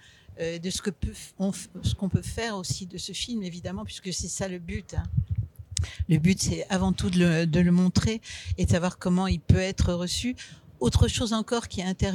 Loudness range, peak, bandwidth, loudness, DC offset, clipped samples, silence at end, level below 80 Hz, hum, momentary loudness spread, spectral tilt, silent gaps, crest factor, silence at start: 7 LU; -4 dBFS; 13.5 kHz; -27 LUFS; under 0.1%; under 0.1%; 0 s; -38 dBFS; none; 11 LU; -5.5 dB/octave; none; 24 dB; 0.3 s